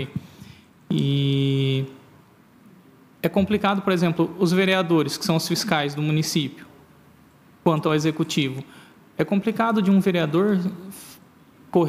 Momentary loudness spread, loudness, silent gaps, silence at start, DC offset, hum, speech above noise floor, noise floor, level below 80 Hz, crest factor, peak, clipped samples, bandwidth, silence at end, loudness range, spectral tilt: 12 LU; -22 LUFS; none; 0 s; under 0.1%; none; 31 dB; -53 dBFS; -60 dBFS; 20 dB; -4 dBFS; under 0.1%; 16 kHz; 0 s; 4 LU; -6 dB/octave